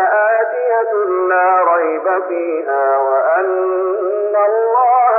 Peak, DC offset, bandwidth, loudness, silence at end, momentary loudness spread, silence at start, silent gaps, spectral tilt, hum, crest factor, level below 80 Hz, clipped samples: -4 dBFS; under 0.1%; 2.9 kHz; -15 LUFS; 0 s; 5 LU; 0 s; none; -3 dB/octave; none; 10 dB; under -90 dBFS; under 0.1%